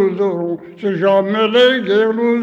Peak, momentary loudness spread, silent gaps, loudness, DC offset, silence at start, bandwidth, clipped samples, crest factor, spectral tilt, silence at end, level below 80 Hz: -2 dBFS; 10 LU; none; -15 LUFS; under 0.1%; 0 s; 7.6 kHz; under 0.1%; 12 dB; -6.5 dB/octave; 0 s; -66 dBFS